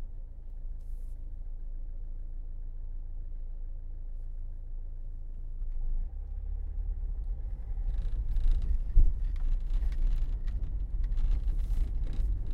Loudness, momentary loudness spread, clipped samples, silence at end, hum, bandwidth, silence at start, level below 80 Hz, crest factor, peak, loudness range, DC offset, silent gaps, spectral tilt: -38 LUFS; 12 LU; under 0.1%; 0 s; none; 2.2 kHz; 0 s; -30 dBFS; 20 dB; -10 dBFS; 11 LU; under 0.1%; none; -8 dB/octave